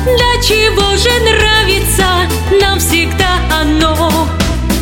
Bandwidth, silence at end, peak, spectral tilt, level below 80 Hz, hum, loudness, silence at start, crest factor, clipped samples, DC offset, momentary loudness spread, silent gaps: 17 kHz; 0 s; 0 dBFS; -3.5 dB/octave; -18 dBFS; none; -10 LUFS; 0 s; 10 dB; under 0.1%; under 0.1%; 4 LU; none